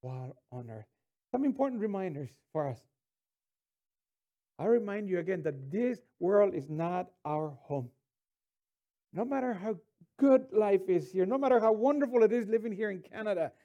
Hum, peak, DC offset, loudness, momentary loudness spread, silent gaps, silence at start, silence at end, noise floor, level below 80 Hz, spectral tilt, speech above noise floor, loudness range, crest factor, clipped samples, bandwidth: none; -14 dBFS; under 0.1%; -31 LUFS; 17 LU; none; 0.05 s; 0.15 s; under -90 dBFS; -80 dBFS; -8.5 dB/octave; over 60 dB; 9 LU; 18 dB; under 0.1%; 9.8 kHz